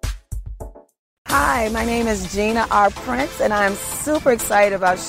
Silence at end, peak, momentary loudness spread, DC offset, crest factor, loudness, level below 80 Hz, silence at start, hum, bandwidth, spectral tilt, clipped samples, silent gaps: 0 s; -4 dBFS; 17 LU; under 0.1%; 16 dB; -19 LUFS; -34 dBFS; 0.05 s; none; 16 kHz; -4 dB/octave; under 0.1%; 0.99-1.25 s